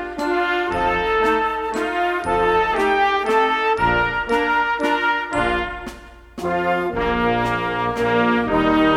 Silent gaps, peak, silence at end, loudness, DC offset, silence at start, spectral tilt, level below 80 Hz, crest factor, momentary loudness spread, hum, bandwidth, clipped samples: none; -4 dBFS; 0 s; -19 LUFS; under 0.1%; 0 s; -5.5 dB/octave; -40 dBFS; 16 dB; 5 LU; none; 15 kHz; under 0.1%